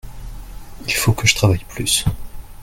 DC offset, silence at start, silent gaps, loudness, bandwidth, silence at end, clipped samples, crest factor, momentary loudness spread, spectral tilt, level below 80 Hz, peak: under 0.1%; 0.05 s; none; -17 LUFS; 17 kHz; 0 s; under 0.1%; 20 dB; 23 LU; -3.5 dB/octave; -34 dBFS; 0 dBFS